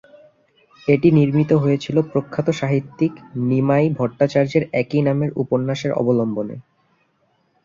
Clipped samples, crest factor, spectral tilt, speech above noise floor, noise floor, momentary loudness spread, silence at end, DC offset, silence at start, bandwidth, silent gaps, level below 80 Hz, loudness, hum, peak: under 0.1%; 18 dB; -8 dB/octave; 46 dB; -64 dBFS; 7 LU; 1.05 s; under 0.1%; 0.85 s; 7.4 kHz; none; -56 dBFS; -19 LUFS; none; -2 dBFS